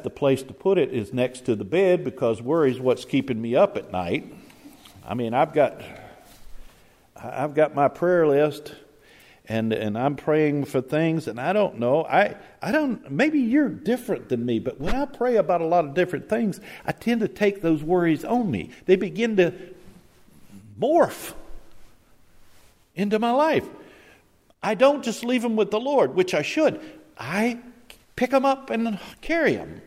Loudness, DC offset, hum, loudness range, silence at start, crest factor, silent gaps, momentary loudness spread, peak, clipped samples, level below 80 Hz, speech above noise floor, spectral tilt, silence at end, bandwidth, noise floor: -23 LUFS; under 0.1%; none; 4 LU; 0 s; 18 dB; none; 10 LU; -6 dBFS; under 0.1%; -50 dBFS; 35 dB; -6.5 dB/octave; 0.05 s; 16 kHz; -58 dBFS